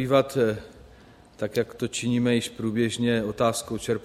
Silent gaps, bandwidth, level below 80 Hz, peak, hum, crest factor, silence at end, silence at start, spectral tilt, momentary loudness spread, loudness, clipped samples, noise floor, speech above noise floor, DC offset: none; 15.5 kHz; -56 dBFS; -8 dBFS; none; 18 dB; 0 s; 0 s; -5 dB/octave; 7 LU; -26 LUFS; under 0.1%; -51 dBFS; 26 dB; under 0.1%